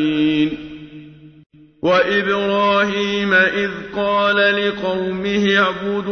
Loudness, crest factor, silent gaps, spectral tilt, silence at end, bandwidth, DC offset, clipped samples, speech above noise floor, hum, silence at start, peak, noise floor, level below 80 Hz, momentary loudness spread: -17 LUFS; 16 dB; 1.46-1.50 s; -5.5 dB/octave; 0 s; 6.6 kHz; under 0.1%; under 0.1%; 23 dB; none; 0 s; -2 dBFS; -40 dBFS; -52 dBFS; 8 LU